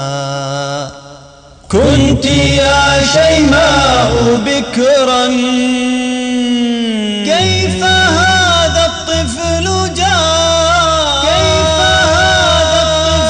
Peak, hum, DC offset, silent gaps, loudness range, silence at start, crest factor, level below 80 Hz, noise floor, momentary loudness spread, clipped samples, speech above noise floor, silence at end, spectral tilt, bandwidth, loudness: -2 dBFS; none; under 0.1%; none; 3 LU; 0 s; 10 dB; -26 dBFS; -37 dBFS; 7 LU; under 0.1%; 28 dB; 0 s; -4 dB/octave; 10 kHz; -10 LUFS